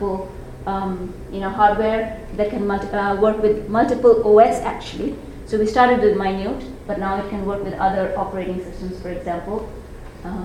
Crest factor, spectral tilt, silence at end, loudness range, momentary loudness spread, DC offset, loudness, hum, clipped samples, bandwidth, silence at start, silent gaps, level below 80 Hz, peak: 18 dB; -6.5 dB/octave; 0 s; 8 LU; 16 LU; under 0.1%; -20 LUFS; none; under 0.1%; 12 kHz; 0 s; none; -38 dBFS; 0 dBFS